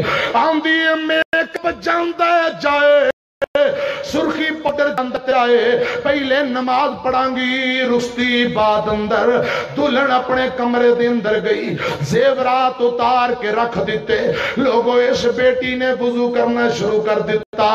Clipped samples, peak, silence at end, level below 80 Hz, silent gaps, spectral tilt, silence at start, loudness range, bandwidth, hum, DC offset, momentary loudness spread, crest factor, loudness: under 0.1%; -4 dBFS; 0 s; -50 dBFS; 1.25-1.32 s, 3.13-3.41 s, 3.47-3.54 s, 17.46-17.53 s; -5 dB/octave; 0 s; 1 LU; 12.5 kHz; none; under 0.1%; 4 LU; 12 dB; -16 LUFS